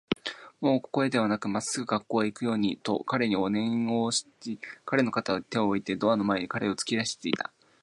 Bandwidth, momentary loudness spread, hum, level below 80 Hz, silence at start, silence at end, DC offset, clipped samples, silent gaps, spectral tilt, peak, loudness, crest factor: 11.5 kHz; 6 LU; none; -66 dBFS; 0.1 s; 0.4 s; under 0.1%; under 0.1%; none; -4.5 dB/octave; -10 dBFS; -28 LUFS; 20 dB